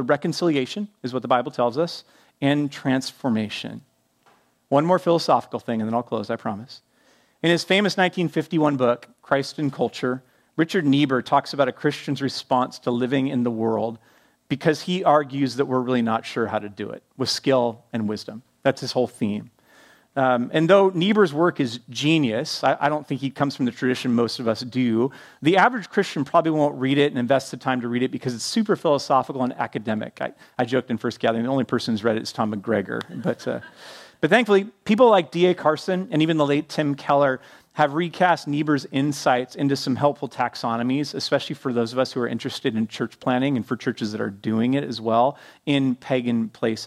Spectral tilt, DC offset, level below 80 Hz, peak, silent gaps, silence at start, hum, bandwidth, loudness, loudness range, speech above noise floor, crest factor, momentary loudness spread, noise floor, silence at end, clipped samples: -5.5 dB/octave; under 0.1%; -68 dBFS; -2 dBFS; none; 0 s; none; 14 kHz; -23 LUFS; 4 LU; 38 dB; 20 dB; 9 LU; -60 dBFS; 0 s; under 0.1%